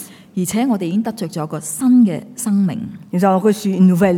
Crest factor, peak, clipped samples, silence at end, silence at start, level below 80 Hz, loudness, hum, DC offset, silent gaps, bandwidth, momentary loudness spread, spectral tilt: 12 dB; -4 dBFS; under 0.1%; 0 s; 0 s; -58 dBFS; -17 LUFS; none; under 0.1%; none; 16.5 kHz; 11 LU; -6.5 dB/octave